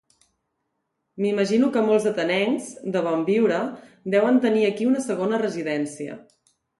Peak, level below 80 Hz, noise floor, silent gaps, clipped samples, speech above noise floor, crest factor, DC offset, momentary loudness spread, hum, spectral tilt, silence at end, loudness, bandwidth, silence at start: -8 dBFS; -72 dBFS; -77 dBFS; none; under 0.1%; 55 dB; 16 dB; under 0.1%; 11 LU; none; -5.5 dB/octave; 0.6 s; -22 LUFS; 11.5 kHz; 1.15 s